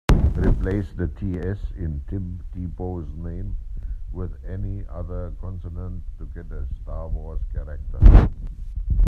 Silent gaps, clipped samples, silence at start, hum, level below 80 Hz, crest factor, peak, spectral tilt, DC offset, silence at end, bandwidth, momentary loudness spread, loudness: none; under 0.1%; 0.1 s; none; -22 dBFS; 22 dB; 0 dBFS; -8.5 dB/octave; under 0.1%; 0 s; 7 kHz; 17 LU; -26 LUFS